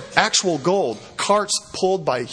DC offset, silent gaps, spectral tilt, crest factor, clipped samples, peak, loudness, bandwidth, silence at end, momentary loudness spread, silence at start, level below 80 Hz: under 0.1%; none; -2.5 dB/octave; 20 dB; under 0.1%; 0 dBFS; -20 LUFS; 10.5 kHz; 0 s; 6 LU; 0 s; -58 dBFS